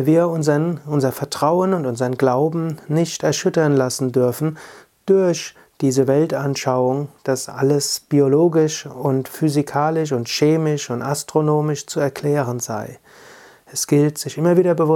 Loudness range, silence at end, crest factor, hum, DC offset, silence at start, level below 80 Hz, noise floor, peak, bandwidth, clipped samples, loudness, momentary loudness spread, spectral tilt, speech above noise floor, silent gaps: 2 LU; 0 s; 16 dB; none; under 0.1%; 0 s; -64 dBFS; -45 dBFS; -2 dBFS; 17.5 kHz; under 0.1%; -19 LUFS; 7 LU; -5.5 dB/octave; 27 dB; none